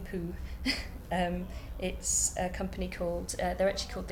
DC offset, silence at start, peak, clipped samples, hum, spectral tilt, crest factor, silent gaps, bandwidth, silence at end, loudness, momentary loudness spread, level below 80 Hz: under 0.1%; 0 s; -16 dBFS; under 0.1%; none; -3.5 dB/octave; 18 dB; none; 18.5 kHz; 0 s; -33 LUFS; 11 LU; -42 dBFS